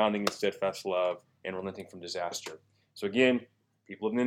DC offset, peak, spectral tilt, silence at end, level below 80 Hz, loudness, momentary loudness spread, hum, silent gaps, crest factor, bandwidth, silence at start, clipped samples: under 0.1%; -8 dBFS; -4.5 dB/octave; 0 s; -76 dBFS; -32 LUFS; 14 LU; none; none; 24 dB; 17.5 kHz; 0 s; under 0.1%